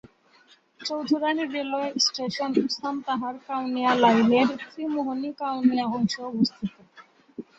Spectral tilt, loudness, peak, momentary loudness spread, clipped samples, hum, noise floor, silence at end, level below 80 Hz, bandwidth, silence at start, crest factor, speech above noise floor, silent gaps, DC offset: -4.5 dB/octave; -25 LUFS; -6 dBFS; 12 LU; under 0.1%; none; -58 dBFS; 0.15 s; -68 dBFS; 8 kHz; 0.8 s; 18 dB; 34 dB; none; under 0.1%